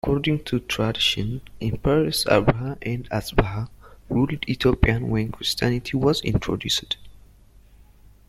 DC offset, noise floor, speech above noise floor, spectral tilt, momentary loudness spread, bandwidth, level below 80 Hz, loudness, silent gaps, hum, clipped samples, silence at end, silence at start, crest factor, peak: under 0.1%; -51 dBFS; 28 dB; -5.5 dB/octave; 10 LU; 16 kHz; -36 dBFS; -23 LUFS; none; none; under 0.1%; 1.1 s; 0.05 s; 22 dB; -2 dBFS